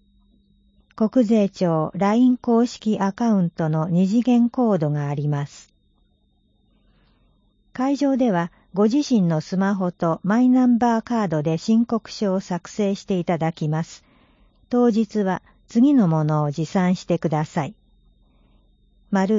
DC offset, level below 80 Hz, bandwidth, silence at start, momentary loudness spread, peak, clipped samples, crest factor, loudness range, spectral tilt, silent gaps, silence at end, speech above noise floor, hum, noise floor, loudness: under 0.1%; -58 dBFS; 7.6 kHz; 1 s; 8 LU; -6 dBFS; under 0.1%; 16 dB; 5 LU; -7.5 dB/octave; none; 0 s; 43 dB; none; -63 dBFS; -21 LUFS